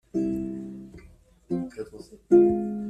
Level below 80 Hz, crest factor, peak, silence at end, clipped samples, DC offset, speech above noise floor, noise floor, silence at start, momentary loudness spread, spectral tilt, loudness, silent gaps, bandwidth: -54 dBFS; 20 dB; -6 dBFS; 0 s; under 0.1%; under 0.1%; 31 dB; -54 dBFS; 0.15 s; 21 LU; -9.5 dB/octave; -24 LUFS; none; 8.2 kHz